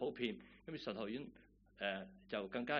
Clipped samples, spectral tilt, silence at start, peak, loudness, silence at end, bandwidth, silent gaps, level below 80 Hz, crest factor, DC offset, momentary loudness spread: under 0.1%; -3 dB/octave; 0 s; -22 dBFS; -45 LUFS; 0 s; 5.4 kHz; none; -72 dBFS; 22 dB; under 0.1%; 9 LU